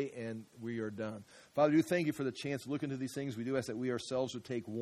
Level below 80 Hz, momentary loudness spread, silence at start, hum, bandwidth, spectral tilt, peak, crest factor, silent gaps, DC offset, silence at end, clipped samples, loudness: -76 dBFS; 13 LU; 0 s; none; 15 kHz; -6 dB/octave; -16 dBFS; 20 dB; none; under 0.1%; 0 s; under 0.1%; -37 LUFS